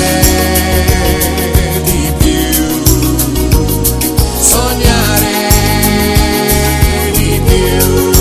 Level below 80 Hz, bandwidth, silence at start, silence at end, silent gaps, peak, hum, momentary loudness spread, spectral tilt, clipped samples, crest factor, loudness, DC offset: -16 dBFS; over 20 kHz; 0 s; 0 s; none; 0 dBFS; none; 3 LU; -4 dB/octave; 0.6%; 10 dB; -10 LUFS; under 0.1%